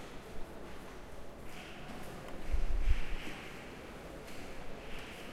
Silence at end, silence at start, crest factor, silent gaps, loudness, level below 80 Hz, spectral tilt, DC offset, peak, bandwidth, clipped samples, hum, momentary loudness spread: 0 s; 0 s; 20 dB; none; -45 LUFS; -40 dBFS; -5 dB/octave; under 0.1%; -16 dBFS; 13 kHz; under 0.1%; none; 11 LU